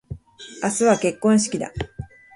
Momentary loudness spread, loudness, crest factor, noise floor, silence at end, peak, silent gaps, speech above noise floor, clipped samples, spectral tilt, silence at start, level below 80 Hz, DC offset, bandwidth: 20 LU; -21 LUFS; 18 dB; -41 dBFS; 0.3 s; -4 dBFS; none; 21 dB; under 0.1%; -4.5 dB/octave; 0.1 s; -46 dBFS; under 0.1%; 11.5 kHz